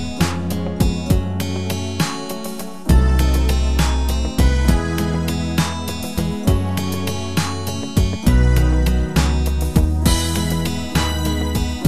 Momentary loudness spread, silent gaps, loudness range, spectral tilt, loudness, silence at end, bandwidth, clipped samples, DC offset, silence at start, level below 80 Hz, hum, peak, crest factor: 7 LU; none; 3 LU; -5.5 dB/octave; -19 LUFS; 0 s; 14 kHz; under 0.1%; 2%; 0 s; -20 dBFS; none; -2 dBFS; 16 dB